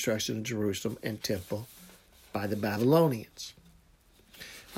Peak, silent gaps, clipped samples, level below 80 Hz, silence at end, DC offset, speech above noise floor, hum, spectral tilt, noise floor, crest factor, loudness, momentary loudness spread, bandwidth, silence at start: -10 dBFS; none; under 0.1%; -64 dBFS; 0 s; under 0.1%; 32 dB; none; -5 dB/octave; -62 dBFS; 22 dB; -31 LUFS; 21 LU; 16 kHz; 0 s